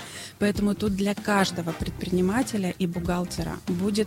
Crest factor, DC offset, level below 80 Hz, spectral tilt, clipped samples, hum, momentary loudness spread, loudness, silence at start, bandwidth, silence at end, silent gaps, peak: 16 dB; under 0.1%; -44 dBFS; -5.5 dB/octave; under 0.1%; none; 7 LU; -26 LUFS; 0 s; 16 kHz; 0 s; none; -10 dBFS